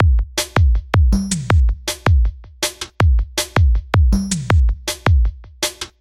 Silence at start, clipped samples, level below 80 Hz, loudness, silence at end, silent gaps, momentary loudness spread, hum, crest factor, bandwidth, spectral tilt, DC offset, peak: 0 s; under 0.1%; -18 dBFS; -18 LUFS; 0.15 s; none; 7 LU; none; 14 dB; 15 kHz; -5 dB/octave; under 0.1%; -2 dBFS